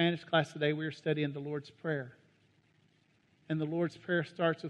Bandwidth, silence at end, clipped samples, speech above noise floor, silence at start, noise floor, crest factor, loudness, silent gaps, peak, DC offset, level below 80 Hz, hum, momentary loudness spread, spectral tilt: 9.8 kHz; 0 s; under 0.1%; 36 dB; 0 s; -70 dBFS; 20 dB; -34 LUFS; none; -14 dBFS; under 0.1%; -78 dBFS; none; 9 LU; -7 dB/octave